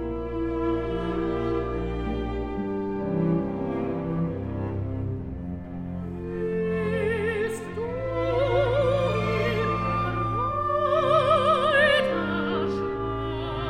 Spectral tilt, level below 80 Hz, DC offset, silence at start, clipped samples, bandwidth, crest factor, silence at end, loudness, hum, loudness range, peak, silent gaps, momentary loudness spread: -7 dB/octave; -40 dBFS; under 0.1%; 0 s; under 0.1%; 14 kHz; 16 dB; 0 s; -26 LUFS; none; 7 LU; -8 dBFS; none; 11 LU